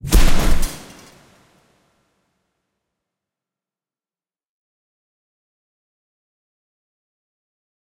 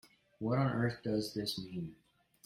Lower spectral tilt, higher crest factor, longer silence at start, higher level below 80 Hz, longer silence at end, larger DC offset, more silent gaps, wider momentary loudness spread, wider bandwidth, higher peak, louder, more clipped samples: second, -4 dB/octave vs -6 dB/octave; about the same, 20 dB vs 16 dB; second, 0.05 s vs 0.4 s; first, -24 dBFS vs -66 dBFS; first, 7.15 s vs 0.5 s; neither; neither; first, 24 LU vs 11 LU; about the same, 16 kHz vs 16 kHz; first, -2 dBFS vs -20 dBFS; first, -21 LUFS vs -36 LUFS; neither